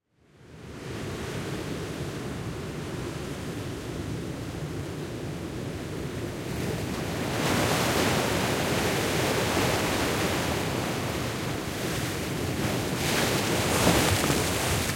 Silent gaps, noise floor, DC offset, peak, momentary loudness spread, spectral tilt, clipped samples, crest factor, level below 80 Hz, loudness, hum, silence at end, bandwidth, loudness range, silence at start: none; -55 dBFS; under 0.1%; -8 dBFS; 11 LU; -4 dB/octave; under 0.1%; 20 dB; -46 dBFS; -28 LUFS; none; 0 s; 16.5 kHz; 9 LU; 0.4 s